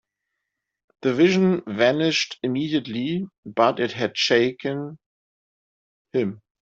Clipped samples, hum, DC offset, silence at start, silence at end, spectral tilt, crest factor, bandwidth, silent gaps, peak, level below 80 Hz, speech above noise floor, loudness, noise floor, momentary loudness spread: under 0.1%; none; under 0.1%; 1.05 s; 0.25 s; -5 dB/octave; 20 dB; 7.8 kHz; 3.38-3.43 s, 5.06-6.05 s; -2 dBFS; -66 dBFS; 60 dB; -22 LUFS; -81 dBFS; 11 LU